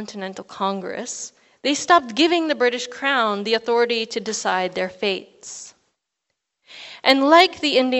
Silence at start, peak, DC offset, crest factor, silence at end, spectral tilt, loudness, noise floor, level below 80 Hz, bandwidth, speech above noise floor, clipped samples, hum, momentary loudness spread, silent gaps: 0 s; 0 dBFS; under 0.1%; 22 dB; 0 s; -2.5 dB/octave; -20 LUFS; -79 dBFS; -68 dBFS; 8.4 kHz; 58 dB; under 0.1%; none; 19 LU; none